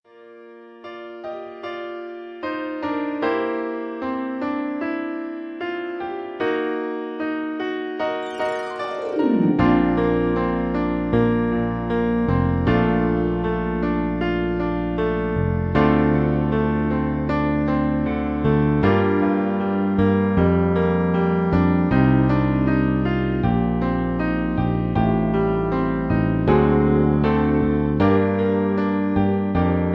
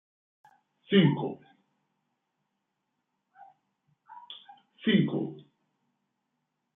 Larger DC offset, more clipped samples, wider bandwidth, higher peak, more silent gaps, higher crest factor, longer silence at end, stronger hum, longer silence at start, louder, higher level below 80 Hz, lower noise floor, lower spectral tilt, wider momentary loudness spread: neither; neither; first, 6 kHz vs 3.9 kHz; first, -4 dBFS vs -10 dBFS; neither; second, 16 dB vs 24 dB; second, 0 s vs 1.35 s; neither; second, 0.2 s vs 0.9 s; first, -21 LUFS vs -27 LUFS; first, -34 dBFS vs -76 dBFS; second, -44 dBFS vs -82 dBFS; about the same, -9.5 dB/octave vs -10 dB/octave; second, 10 LU vs 23 LU